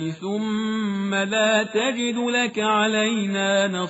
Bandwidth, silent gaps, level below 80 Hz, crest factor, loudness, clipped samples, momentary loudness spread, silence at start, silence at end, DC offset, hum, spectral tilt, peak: 8 kHz; none; -66 dBFS; 16 dB; -22 LUFS; under 0.1%; 5 LU; 0 s; 0 s; under 0.1%; none; -3 dB/octave; -6 dBFS